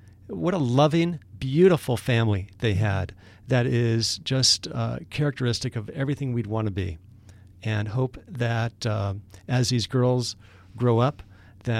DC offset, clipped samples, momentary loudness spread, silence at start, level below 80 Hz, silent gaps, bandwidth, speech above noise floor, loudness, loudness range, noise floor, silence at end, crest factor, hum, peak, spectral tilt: under 0.1%; under 0.1%; 12 LU; 0.3 s; -52 dBFS; none; 14 kHz; 25 dB; -25 LUFS; 6 LU; -49 dBFS; 0 s; 18 dB; none; -6 dBFS; -5.5 dB/octave